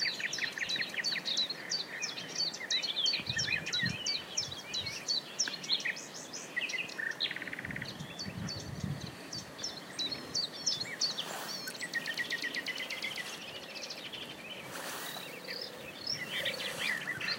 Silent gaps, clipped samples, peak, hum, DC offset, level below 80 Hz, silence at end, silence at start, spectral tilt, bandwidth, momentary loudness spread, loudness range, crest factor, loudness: none; under 0.1%; -18 dBFS; none; under 0.1%; -68 dBFS; 0 s; 0 s; -1.5 dB/octave; 16.5 kHz; 10 LU; 6 LU; 20 dB; -35 LUFS